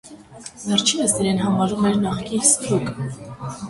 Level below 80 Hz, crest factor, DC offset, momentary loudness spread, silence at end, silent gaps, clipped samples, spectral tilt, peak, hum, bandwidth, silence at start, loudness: -50 dBFS; 20 dB; under 0.1%; 17 LU; 0 s; none; under 0.1%; -3.5 dB/octave; -2 dBFS; none; 11.5 kHz; 0.05 s; -19 LUFS